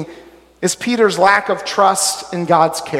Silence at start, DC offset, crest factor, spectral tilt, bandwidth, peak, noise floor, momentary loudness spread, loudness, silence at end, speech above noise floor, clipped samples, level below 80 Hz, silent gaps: 0 s; under 0.1%; 16 dB; -3 dB/octave; 16.5 kHz; 0 dBFS; -42 dBFS; 9 LU; -15 LUFS; 0 s; 27 dB; under 0.1%; -58 dBFS; none